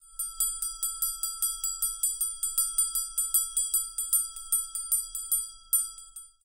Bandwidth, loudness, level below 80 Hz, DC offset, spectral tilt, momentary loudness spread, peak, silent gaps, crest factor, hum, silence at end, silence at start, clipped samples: 17 kHz; -27 LUFS; -54 dBFS; under 0.1%; 4.5 dB/octave; 4 LU; -12 dBFS; none; 20 dB; none; 0.15 s; 0.05 s; under 0.1%